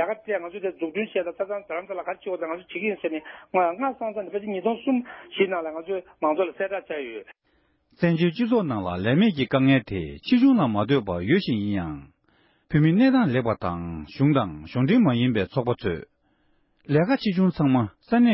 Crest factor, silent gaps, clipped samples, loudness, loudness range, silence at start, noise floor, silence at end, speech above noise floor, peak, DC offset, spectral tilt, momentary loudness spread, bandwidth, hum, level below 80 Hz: 16 dB; none; under 0.1%; -24 LUFS; 6 LU; 0 s; -67 dBFS; 0 s; 43 dB; -8 dBFS; under 0.1%; -11.5 dB/octave; 12 LU; 5.8 kHz; none; -52 dBFS